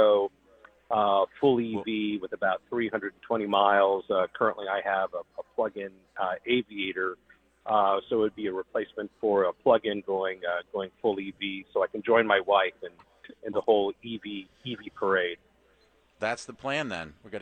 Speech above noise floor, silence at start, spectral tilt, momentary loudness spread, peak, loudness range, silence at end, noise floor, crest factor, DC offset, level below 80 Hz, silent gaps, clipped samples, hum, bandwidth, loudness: 36 dB; 0 s; -5.5 dB/octave; 14 LU; -8 dBFS; 4 LU; 0 s; -64 dBFS; 20 dB; under 0.1%; -68 dBFS; none; under 0.1%; none; 9.4 kHz; -28 LUFS